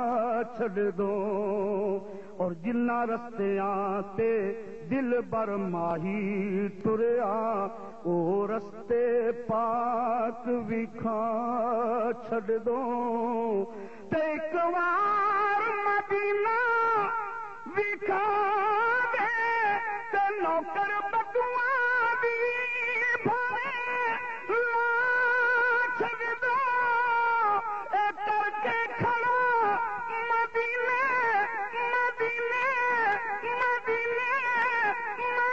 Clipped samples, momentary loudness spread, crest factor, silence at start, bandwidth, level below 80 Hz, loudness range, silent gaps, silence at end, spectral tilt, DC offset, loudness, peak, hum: under 0.1%; 6 LU; 14 dB; 0 s; 7.8 kHz; -68 dBFS; 4 LU; none; 0 s; -6.5 dB/octave; 0.4%; -28 LUFS; -14 dBFS; none